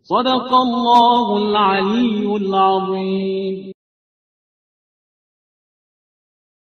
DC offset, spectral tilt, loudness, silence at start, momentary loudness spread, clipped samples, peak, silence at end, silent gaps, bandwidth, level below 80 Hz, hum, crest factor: under 0.1%; -6.5 dB/octave; -16 LUFS; 0.1 s; 9 LU; under 0.1%; 0 dBFS; 3 s; none; 8 kHz; -60 dBFS; none; 18 dB